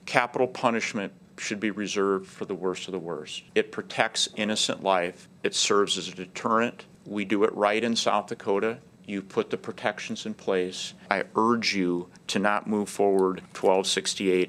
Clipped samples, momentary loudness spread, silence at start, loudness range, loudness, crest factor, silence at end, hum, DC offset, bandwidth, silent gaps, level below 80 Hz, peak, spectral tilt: under 0.1%; 11 LU; 0.05 s; 4 LU; -27 LUFS; 24 dB; 0 s; none; under 0.1%; 14 kHz; none; -74 dBFS; -2 dBFS; -3.5 dB/octave